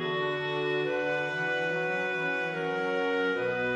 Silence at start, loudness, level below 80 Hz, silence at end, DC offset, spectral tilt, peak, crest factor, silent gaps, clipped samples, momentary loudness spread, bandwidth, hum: 0 s; -29 LUFS; -70 dBFS; 0 s; under 0.1%; -5.5 dB/octave; -18 dBFS; 10 dB; none; under 0.1%; 2 LU; 9.4 kHz; none